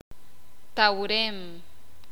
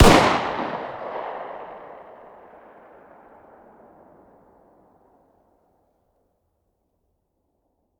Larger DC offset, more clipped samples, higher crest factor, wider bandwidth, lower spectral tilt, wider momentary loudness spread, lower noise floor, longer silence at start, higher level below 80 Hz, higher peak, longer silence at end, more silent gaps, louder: first, 2% vs under 0.1%; neither; about the same, 24 dB vs 26 dB; about the same, over 20 kHz vs over 20 kHz; second, -3.5 dB/octave vs -5 dB/octave; second, 18 LU vs 30 LU; second, -58 dBFS vs -73 dBFS; first, 0.75 s vs 0 s; second, -58 dBFS vs -36 dBFS; second, -6 dBFS vs 0 dBFS; second, 0.5 s vs 6.05 s; neither; about the same, -25 LUFS vs -23 LUFS